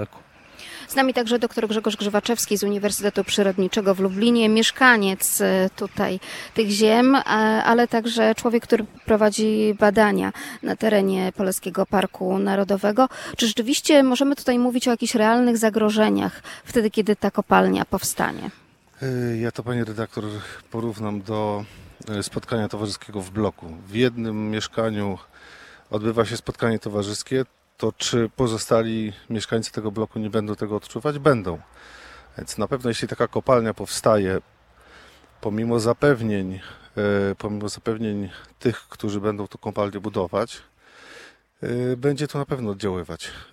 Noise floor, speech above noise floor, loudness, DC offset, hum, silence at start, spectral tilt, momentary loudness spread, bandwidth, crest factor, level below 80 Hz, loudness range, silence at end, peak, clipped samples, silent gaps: -51 dBFS; 29 dB; -22 LUFS; under 0.1%; none; 0 s; -4.5 dB/octave; 13 LU; 16.5 kHz; 20 dB; -54 dBFS; 9 LU; 0.1 s; -2 dBFS; under 0.1%; none